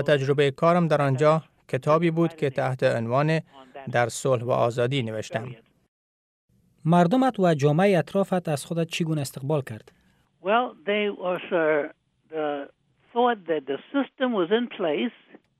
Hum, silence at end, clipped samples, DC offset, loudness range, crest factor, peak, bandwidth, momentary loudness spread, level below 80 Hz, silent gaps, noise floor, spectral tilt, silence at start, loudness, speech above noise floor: none; 0.5 s; under 0.1%; under 0.1%; 4 LU; 16 dB; -8 dBFS; 14 kHz; 11 LU; -68 dBFS; 5.88-6.48 s; under -90 dBFS; -6.5 dB/octave; 0 s; -24 LUFS; over 66 dB